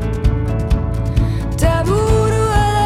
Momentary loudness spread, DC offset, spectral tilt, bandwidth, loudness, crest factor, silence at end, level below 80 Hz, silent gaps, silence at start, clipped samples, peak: 4 LU; under 0.1%; -6.5 dB/octave; 14.5 kHz; -17 LUFS; 12 dB; 0 s; -20 dBFS; none; 0 s; under 0.1%; -4 dBFS